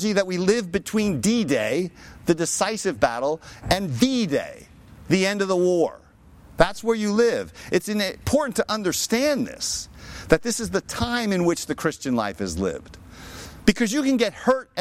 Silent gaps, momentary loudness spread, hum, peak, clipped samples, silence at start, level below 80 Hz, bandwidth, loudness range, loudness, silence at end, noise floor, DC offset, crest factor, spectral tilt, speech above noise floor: none; 8 LU; none; -2 dBFS; under 0.1%; 0 s; -46 dBFS; 16.5 kHz; 2 LU; -23 LUFS; 0 s; -49 dBFS; under 0.1%; 20 dB; -4.5 dB/octave; 27 dB